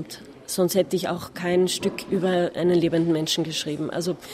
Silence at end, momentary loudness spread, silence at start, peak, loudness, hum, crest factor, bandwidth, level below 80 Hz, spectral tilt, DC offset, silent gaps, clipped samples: 0 s; 8 LU; 0 s; -8 dBFS; -24 LUFS; none; 16 dB; 16 kHz; -60 dBFS; -5 dB/octave; under 0.1%; none; under 0.1%